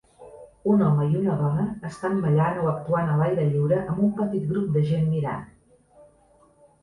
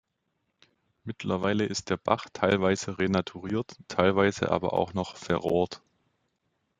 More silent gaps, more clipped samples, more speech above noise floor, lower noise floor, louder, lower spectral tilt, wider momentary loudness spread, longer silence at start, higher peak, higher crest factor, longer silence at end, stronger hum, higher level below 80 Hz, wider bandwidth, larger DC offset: neither; neither; second, 35 dB vs 51 dB; second, -58 dBFS vs -78 dBFS; first, -24 LUFS vs -28 LUFS; first, -9.5 dB/octave vs -5.5 dB/octave; about the same, 6 LU vs 8 LU; second, 0.2 s vs 1.05 s; second, -10 dBFS vs -6 dBFS; second, 14 dB vs 24 dB; first, 1.35 s vs 1.05 s; neither; first, -54 dBFS vs -62 dBFS; first, 10.5 kHz vs 9.4 kHz; neither